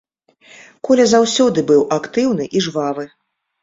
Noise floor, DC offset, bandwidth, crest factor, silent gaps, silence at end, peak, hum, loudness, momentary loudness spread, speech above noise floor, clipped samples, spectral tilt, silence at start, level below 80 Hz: -49 dBFS; under 0.1%; 7.8 kHz; 16 dB; none; 0.55 s; -2 dBFS; none; -15 LUFS; 13 LU; 34 dB; under 0.1%; -4.5 dB/octave; 0.85 s; -58 dBFS